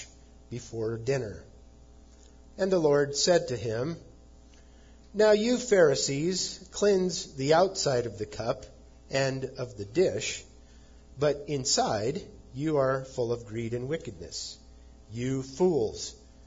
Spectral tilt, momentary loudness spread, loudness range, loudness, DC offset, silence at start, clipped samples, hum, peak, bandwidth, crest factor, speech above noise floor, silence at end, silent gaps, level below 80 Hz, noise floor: -4.5 dB/octave; 16 LU; 6 LU; -28 LUFS; under 0.1%; 0 s; under 0.1%; none; -10 dBFS; 7.8 kHz; 18 dB; 25 dB; 0.3 s; none; -54 dBFS; -53 dBFS